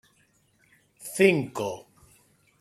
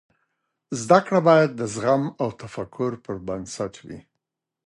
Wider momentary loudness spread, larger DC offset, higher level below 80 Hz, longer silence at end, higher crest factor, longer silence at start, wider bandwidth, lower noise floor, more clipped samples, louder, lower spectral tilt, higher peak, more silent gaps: first, 21 LU vs 17 LU; neither; second, -68 dBFS vs -58 dBFS; about the same, 0.8 s vs 0.7 s; about the same, 24 dB vs 22 dB; first, 1 s vs 0.7 s; first, 14.5 kHz vs 11.5 kHz; second, -66 dBFS vs -82 dBFS; neither; second, -25 LUFS vs -22 LUFS; about the same, -5 dB/octave vs -6 dB/octave; second, -6 dBFS vs -2 dBFS; neither